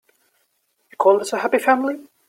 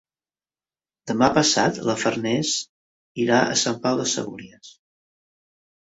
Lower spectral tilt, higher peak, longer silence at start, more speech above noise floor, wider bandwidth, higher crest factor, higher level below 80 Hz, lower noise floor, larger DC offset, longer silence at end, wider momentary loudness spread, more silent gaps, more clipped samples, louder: about the same, -3.5 dB/octave vs -3.5 dB/octave; about the same, -2 dBFS vs -2 dBFS; about the same, 1 s vs 1.05 s; second, 50 dB vs over 68 dB; first, 16.5 kHz vs 8.2 kHz; about the same, 20 dB vs 22 dB; second, -72 dBFS vs -58 dBFS; second, -68 dBFS vs under -90 dBFS; neither; second, 0.25 s vs 1.15 s; second, 4 LU vs 18 LU; second, none vs 2.69-3.15 s; neither; about the same, -19 LUFS vs -21 LUFS